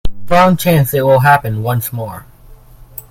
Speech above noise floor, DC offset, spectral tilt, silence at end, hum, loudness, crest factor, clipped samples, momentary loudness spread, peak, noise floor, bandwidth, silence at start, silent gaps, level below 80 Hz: 27 dB; under 0.1%; -6 dB/octave; 0.25 s; none; -12 LUFS; 14 dB; 0.3%; 21 LU; 0 dBFS; -39 dBFS; 17 kHz; 0.05 s; none; -32 dBFS